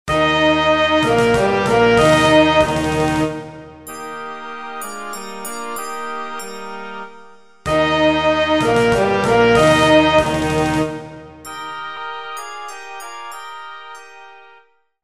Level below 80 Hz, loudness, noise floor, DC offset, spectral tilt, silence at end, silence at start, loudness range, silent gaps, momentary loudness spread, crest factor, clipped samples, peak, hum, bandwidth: -40 dBFS; -15 LUFS; -52 dBFS; under 0.1%; -5 dB/octave; 0.7 s; 0.05 s; 14 LU; none; 20 LU; 16 dB; under 0.1%; 0 dBFS; none; 15.5 kHz